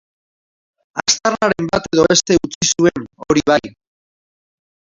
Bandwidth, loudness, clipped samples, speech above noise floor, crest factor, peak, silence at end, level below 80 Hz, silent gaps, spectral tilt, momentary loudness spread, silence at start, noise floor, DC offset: 7.8 kHz; -15 LUFS; under 0.1%; over 75 dB; 18 dB; 0 dBFS; 1.25 s; -46 dBFS; 2.55-2.61 s; -3 dB/octave; 6 LU; 0.95 s; under -90 dBFS; under 0.1%